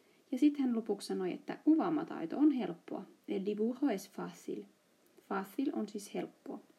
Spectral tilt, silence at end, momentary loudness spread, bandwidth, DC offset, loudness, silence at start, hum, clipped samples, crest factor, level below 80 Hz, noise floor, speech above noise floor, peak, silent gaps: -6 dB/octave; 0.15 s; 14 LU; 14 kHz; under 0.1%; -36 LUFS; 0.3 s; none; under 0.1%; 16 dB; under -90 dBFS; -67 dBFS; 32 dB; -20 dBFS; none